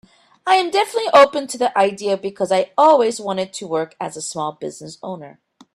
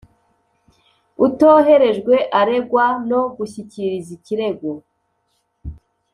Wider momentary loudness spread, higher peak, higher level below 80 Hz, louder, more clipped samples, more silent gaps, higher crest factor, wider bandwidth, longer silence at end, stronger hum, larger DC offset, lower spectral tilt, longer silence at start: second, 18 LU vs 22 LU; about the same, 0 dBFS vs -2 dBFS; second, -66 dBFS vs -48 dBFS; about the same, -18 LUFS vs -16 LUFS; neither; neither; about the same, 18 dB vs 16 dB; first, 13.5 kHz vs 10.5 kHz; about the same, 0.45 s vs 0.4 s; neither; neither; second, -3.5 dB/octave vs -6.5 dB/octave; second, 0.45 s vs 1.2 s